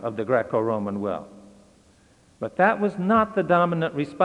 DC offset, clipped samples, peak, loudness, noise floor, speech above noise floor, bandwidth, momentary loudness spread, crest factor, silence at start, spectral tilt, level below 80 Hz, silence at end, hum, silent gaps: under 0.1%; under 0.1%; -6 dBFS; -23 LUFS; -57 dBFS; 34 dB; 10.5 kHz; 10 LU; 18 dB; 0 s; -8 dB/octave; -62 dBFS; 0 s; none; none